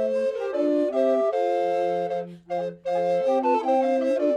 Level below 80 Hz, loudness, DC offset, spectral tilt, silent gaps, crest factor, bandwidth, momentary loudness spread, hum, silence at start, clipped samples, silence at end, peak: -70 dBFS; -24 LUFS; under 0.1%; -6.5 dB/octave; none; 12 dB; 9 kHz; 8 LU; none; 0 s; under 0.1%; 0 s; -12 dBFS